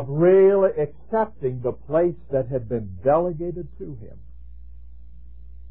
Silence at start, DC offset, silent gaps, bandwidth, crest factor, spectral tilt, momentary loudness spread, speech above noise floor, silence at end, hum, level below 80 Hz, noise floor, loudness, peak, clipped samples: 0 s; 1%; none; 3.3 kHz; 16 dB; -13 dB/octave; 20 LU; 23 dB; 0 s; none; -46 dBFS; -44 dBFS; -22 LUFS; -8 dBFS; under 0.1%